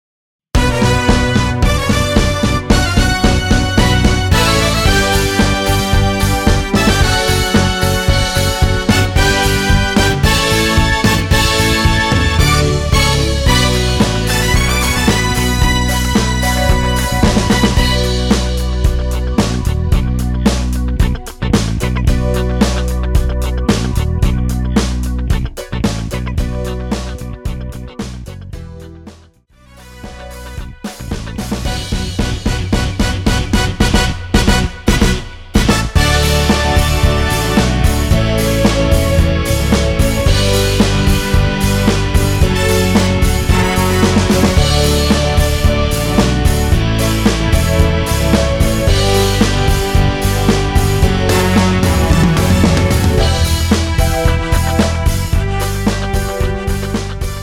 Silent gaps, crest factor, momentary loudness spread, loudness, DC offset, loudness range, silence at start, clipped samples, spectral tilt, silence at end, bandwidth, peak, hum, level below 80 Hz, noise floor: none; 12 dB; 8 LU; -14 LUFS; under 0.1%; 7 LU; 0.55 s; under 0.1%; -5 dB/octave; 0 s; 17 kHz; 0 dBFS; none; -18 dBFS; -45 dBFS